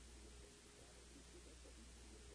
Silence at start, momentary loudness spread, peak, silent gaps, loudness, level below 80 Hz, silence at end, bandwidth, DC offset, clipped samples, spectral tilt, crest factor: 0 s; 1 LU; -48 dBFS; none; -61 LUFS; -64 dBFS; 0 s; 11 kHz; under 0.1%; under 0.1%; -3.5 dB/octave; 12 dB